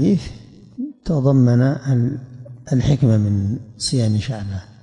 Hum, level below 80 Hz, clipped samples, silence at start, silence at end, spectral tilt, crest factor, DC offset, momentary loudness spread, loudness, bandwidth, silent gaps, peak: none; -42 dBFS; under 0.1%; 0 s; 0.2 s; -7 dB/octave; 14 dB; under 0.1%; 17 LU; -19 LUFS; 10.5 kHz; none; -6 dBFS